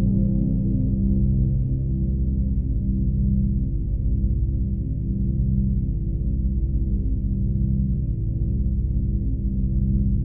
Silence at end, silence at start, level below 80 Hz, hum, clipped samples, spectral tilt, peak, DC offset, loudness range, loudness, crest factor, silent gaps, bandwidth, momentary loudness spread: 0 s; 0 s; -24 dBFS; none; under 0.1%; -15 dB/octave; -10 dBFS; 1%; 2 LU; -24 LUFS; 12 dB; none; 0.8 kHz; 4 LU